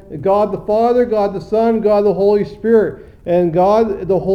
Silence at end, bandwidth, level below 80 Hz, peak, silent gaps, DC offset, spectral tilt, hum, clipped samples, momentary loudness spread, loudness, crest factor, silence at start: 0 s; 6.8 kHz; -42 dBFS; -2 dBFS; none; 0.1%; -8.5 dB/octave; none; under 0.1%; 5 LU; -15 LUFS; 12 dB; 0.1 s